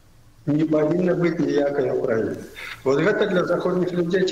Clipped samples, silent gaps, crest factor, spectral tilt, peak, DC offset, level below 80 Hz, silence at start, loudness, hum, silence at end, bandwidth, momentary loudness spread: under 0.1%; none; 14 dB; -7 dB/octave; -8 dBFS; under 0.1%; -54 dBFS; 0.45 s; -22 LUFS; none; 0 s; 15 kHz; 8 LU